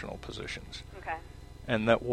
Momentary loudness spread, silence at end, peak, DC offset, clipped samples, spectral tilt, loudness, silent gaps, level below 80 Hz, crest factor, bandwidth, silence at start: 18 LU; 0 s; -8 dBFS; under 0.1%; under 0.1%; -5.5 dB/octave; -34 LUFS; none; -50 dBFS; 26 dB; 13 kHz; 0 s